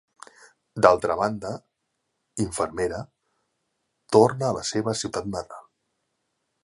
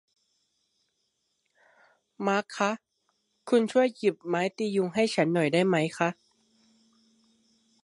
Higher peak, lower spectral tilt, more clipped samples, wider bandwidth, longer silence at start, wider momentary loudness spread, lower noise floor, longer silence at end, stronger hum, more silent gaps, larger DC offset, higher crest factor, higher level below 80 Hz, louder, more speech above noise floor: first, 0 dBFS vs -8 dBFS; about the same, -5 dB/octave vs -5.5 dB/octave; neither; about the same, 11.5 kHz vs 11.5 kHz; second, 0.75 s vs 2.2 s; first, 20 LU vs 6 LU; about the same, -78 dBFS vs -77 dBFS; second, 1.05 s vs 1.7 s; neither; neither; neither; first, 26 dB vs 20 dB; first, -54 dBFS vs -78 dBFS; first, -24 LUFS vs -27 LUFS; about the same, 54 dB vs 51 dB